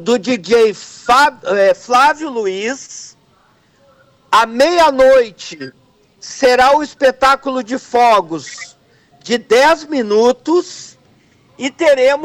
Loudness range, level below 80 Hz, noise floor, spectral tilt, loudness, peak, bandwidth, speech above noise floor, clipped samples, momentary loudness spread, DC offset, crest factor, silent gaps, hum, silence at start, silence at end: 3 LU; -50 dBFS; -53 dBFS; -3 dB/octave; -13 LUFS; -4 dBFS; 15.5 kHz; 40 dB; under 0.1%; 19 LU; under 0.1%; 10 dB; none; none; 0 s; 0 s